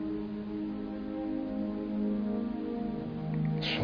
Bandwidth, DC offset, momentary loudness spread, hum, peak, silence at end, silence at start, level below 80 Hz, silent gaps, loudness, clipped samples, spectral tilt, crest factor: 5.4 kHz; under 0.1%; 5 LU; none; -20 dBFS; 0 s; 0 s; -54 dBFS; none; -35 LUFS; under 0.1%; -5.5 dB/octave; 14 dB